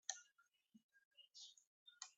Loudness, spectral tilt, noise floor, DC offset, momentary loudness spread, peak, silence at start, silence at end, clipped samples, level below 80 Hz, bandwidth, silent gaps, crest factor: -58 LUFS; 2.5 dB/octave; -80 dBFS; under 0.1%; 15 LU; -26 dBFS; 0.1 s; 0.05 s; under 0.1%; under -90 dBFS; 8 kHz; 0.84-0.89 s, 1.05-1.11 s, 1.67-1.86 s; 34 dB